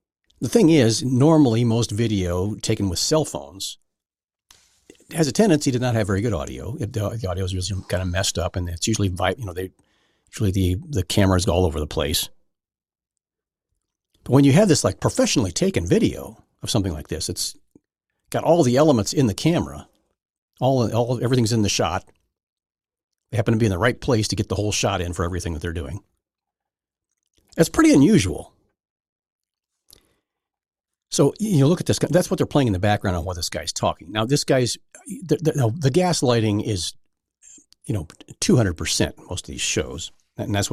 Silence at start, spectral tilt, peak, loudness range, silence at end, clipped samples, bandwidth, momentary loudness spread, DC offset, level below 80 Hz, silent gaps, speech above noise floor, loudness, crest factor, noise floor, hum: 0.4 s; -5 dB/octave; -4 dBFS; 5 LU; 0 s; under 0.1%; 15 kHz; 14 LU; under 0.1%; -44 dBFS; 20.30-20.48 s, 22.43-22.57 s, 23.04-23.08 s, 28.90-28.96 s, 29.09-29.16 s, 29.32-29.39 s; over 70 dB; -21 LUFS; 18 dB; under -90 dBFS; none